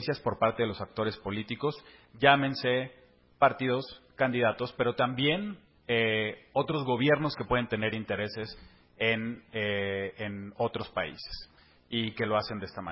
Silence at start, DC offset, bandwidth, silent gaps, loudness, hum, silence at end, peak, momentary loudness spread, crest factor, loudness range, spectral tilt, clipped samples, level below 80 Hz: 0 s; under 0.1%; 5.8 kHz; none; -30 LUFS; none; 0 s; -6 dBFS; 12 LU; 26 dB; 5 LU; -9.5 dB/octave; under 0.1%; -58 dBFS